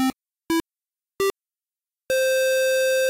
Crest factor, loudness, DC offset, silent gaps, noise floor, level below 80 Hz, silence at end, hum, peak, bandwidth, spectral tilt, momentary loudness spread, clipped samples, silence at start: 6 dB; -23 LUFS; under 0.1%; none; under -90 dBFS; -60 dBFS; 0 s; none; -16 dBFS; 16 kHz; -2 dB/octave; 6 LU; under 0.1%; 0 s